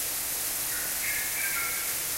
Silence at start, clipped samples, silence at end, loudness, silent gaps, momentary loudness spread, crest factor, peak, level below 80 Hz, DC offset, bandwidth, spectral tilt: 0 s; under 0.1%; 0 s; -27 LUFS; none; 1 LU; 14 dB; -16 dBFS; -56 dBFS; under 0.1%; 16 kHz; 0.5 dB/octave